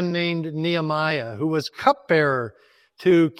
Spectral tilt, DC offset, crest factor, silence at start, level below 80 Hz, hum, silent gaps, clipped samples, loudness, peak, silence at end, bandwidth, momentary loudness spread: -6.5 dB/octave; under 0.1%; 20 dB; 0 s; -66 dBFS; none; none; under 0.1%; -22 LUFS; -2 dBFS; 0.1 s; 13 kHz; 6 LU